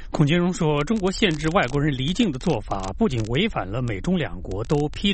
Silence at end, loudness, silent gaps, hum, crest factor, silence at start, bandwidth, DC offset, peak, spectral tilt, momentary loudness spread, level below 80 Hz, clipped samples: 0 s; -23 LUFS; none; none; 16 dB; 0 s; 8.8 kHz; under 0.1%; -6 dBFS; -6 dB/octave; 6 LU; -36 dBFS; under 0.1%